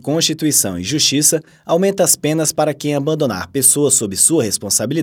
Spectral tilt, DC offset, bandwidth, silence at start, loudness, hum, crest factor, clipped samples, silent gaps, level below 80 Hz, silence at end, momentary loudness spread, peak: -3 dB/octave; under 0.1%; 19.5 kHz; 0.05 s; -14 LUFS; none; 16 dB; under 0.1%; none; -56 dBFS; 0 s; 7 LU; 0 dBFS